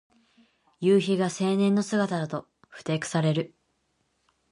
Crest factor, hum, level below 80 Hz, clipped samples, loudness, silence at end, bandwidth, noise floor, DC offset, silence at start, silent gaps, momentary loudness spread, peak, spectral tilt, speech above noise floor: 16 dB; none; -72 dBFS; under 0.1%; -26 LUFS; 1.05 s; 11.5 kHz; -73 dBFS; under 0.1%; 0.8 s; none; 12 LU; -10 dBFS; -6 dB/octave; 48 dB